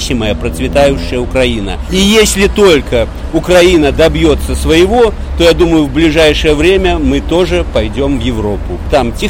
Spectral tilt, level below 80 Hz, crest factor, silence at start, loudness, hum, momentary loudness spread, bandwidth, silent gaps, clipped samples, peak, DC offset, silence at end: -5 dB/octave; -18 dBFS; 10 dB; 0 s; -10 LUFS; none; 8 LU; 16.5 kHz; none; under 0.1%; 0 dBFS; under 0.1%; 0 s